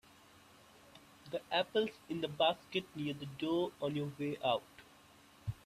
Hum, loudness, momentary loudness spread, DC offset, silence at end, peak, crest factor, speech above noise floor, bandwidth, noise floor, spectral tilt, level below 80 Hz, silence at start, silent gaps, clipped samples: none; -37 LUFS; 13 LU; under 0.1%; 0.1 s; -18 dBFS; 20 dB; 25 dB; 14 kHz; -62 dBFS; -6 dB/octave; -68 dBFS; 0.95 s; none; under 0.1%